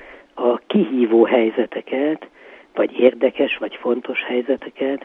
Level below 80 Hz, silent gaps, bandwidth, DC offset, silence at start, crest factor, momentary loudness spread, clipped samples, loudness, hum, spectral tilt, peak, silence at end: -64 dBFS; none; 4 kHz; under 0.1%; 0 s; 20 dB; 9 LU; under 0.1%; -19 LUFS; none; -8.5 dB/octave; 0 dBFS; 0 s